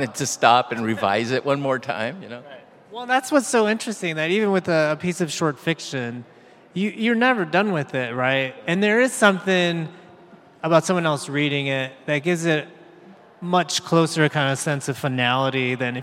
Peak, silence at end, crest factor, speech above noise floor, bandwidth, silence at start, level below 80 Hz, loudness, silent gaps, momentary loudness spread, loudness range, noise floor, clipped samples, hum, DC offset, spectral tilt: 0 dBFS; 0 s; 22 dB; 27 dB; 16 kHz; 0 s; -72 dBFS; -21 LUFS; none; 10 LU; 3 LU; -48 dBFS; under 0.1%; none; under 0.1%; -4.5 dB/octave